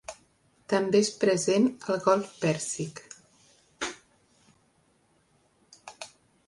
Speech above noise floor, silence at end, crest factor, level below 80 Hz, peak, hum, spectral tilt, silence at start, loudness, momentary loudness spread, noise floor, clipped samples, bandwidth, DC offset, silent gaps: 41 dB; 0.4 s; 20 dB; -70 dBFS; -10 dBFS; none; -4.5 dB/octave; 0.1 s; -27 LUFS; 25 LU; -67 dBFS; under 0.1%; 11.5 kHz; under 0.1%; none